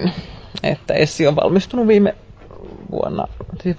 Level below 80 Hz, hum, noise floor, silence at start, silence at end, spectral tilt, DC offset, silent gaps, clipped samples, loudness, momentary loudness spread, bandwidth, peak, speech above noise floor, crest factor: -42 dBFS; none; -37 dBFS; 0 s; 0 s; -6.5 dB/octave; under 0.1%; none; under 0.1%; -18 LUFS; 20 LU; 8 kHz; -2 dBFS; 21 dB; 16 dB